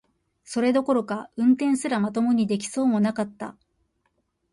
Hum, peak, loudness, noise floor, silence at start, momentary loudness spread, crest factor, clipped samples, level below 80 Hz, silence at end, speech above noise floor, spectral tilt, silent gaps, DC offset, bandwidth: none; -10 dBFS; -24 LUFS; -72 dBFS; 0.5 s; 11 LU; 16 dB; under 0.1%; -66 dBFS; 1 s; 49 dB; -5.5 dB/octave; none; under 0.1%; 11.5 kHz